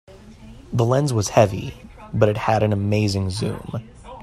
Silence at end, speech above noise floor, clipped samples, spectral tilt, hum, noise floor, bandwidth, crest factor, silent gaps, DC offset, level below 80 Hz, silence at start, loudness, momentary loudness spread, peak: 0 s; 22 dB; under 0.1%; -6 dB/octave; none; -42 dBFS; 13.5 kHz; 20 dB; none; under 0.1%; -46 dBFS; 0.1 s; -21 LUFS; 15 LU; 0 dBFS